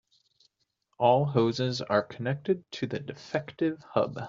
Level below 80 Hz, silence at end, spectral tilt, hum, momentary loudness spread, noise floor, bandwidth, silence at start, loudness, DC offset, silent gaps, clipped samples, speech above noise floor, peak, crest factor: -68 dBFS; 0 s; -5.5 dB/octave; none; 10 LU; -76 dBFS; 7.6 kHz; 1 s; -29 LUFS; under 0.1%; none; under 0.1%; 48 dB; -8 dBFS; 20 dB